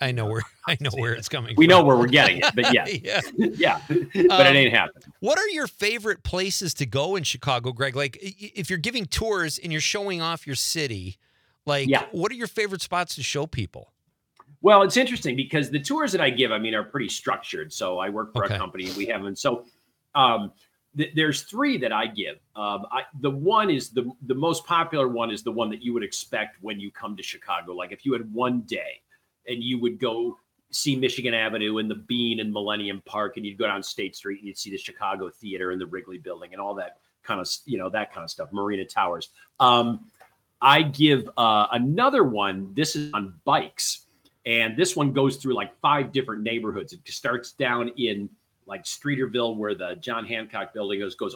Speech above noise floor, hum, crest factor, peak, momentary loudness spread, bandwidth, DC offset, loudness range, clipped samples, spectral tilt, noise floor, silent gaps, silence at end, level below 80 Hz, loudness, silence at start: 36 dB; none; 24 dB; 0 dBFS; 15 LU; 19.5 kHz; under 0.1%; 10 LU; under 0.1%; -4 dB/octave; -60 dBFS; none; 0 s; -56 dBFS; -24 LUFS; 0 s